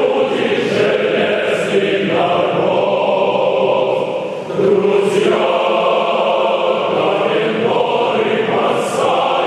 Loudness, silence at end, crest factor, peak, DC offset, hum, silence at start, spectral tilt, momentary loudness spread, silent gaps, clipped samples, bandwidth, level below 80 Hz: -15 LUFS; 0 s; 12 dB; -2 dBFS; under 0.1%; none; 0 s; -5 dB/octave; 2 LU; none; under 0.1%; 12.5 kHz; -64 dBFS